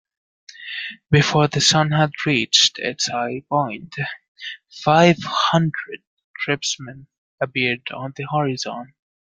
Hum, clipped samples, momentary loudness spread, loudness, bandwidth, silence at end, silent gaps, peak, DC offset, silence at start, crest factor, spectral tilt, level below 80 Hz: none; under 0.1%; 18 LU; -19 LUFS; 9.4 kHz; 0.35 s; 4.28-4.35 s, 6.07-6.17 s, 6.24-6.34 s, 7.18-7.38 s; -2 dBFS; under 0.1%; 0.5 s; 20 dB; -4 dB/octave; -58 dBFS